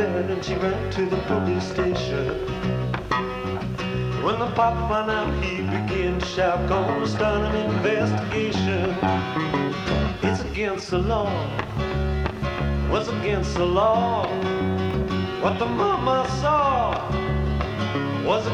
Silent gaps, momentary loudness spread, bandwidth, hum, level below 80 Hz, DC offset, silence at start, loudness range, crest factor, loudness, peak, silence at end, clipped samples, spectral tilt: none; 5 LU; 11 kHz; none; -34 dBFS; under 0.1%; 0 s; 2 LU; 14 dB; -24 LUFS; -10 dBFS; 0 s; under 0.1%; -6.5 dB/octave